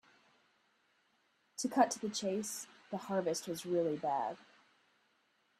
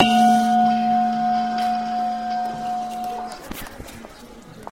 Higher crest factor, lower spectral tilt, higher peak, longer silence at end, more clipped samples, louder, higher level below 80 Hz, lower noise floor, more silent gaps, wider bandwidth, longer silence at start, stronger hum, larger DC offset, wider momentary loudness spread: first, 26 dB vs 18 dB; about the same, -4 dB/octave vs -4.5 dB/octave; second, -14 dBFS vs -2 dBFS; first, 1.15 s vs 0 s; neither; second, -37 LUFS vs -21 LUFS; second, -84 dBFS vs -50 dBFS; first, -76 dBFS vs -42 dBFS; neither; about the same, 15.5 kHz vs 16.5 kHz; first, 1.6 s vs 0 s; neither; second, under 0.1% vs 0.2%; second, 13 LU vs 22 LU